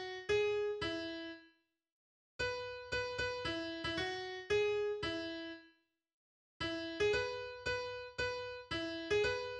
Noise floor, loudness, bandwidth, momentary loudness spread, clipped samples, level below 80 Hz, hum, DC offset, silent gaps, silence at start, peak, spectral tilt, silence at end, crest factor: -71 dBFS; -38 LUFS; 9.6 kHz; 10 LU; under 0.1%; -62 dBFS; none; under 0.1%; 1.92-2.39 s, 6.14-6.60 s; 0 s; -24 dBFS; -4 dB/octave; 0 s; 16 dB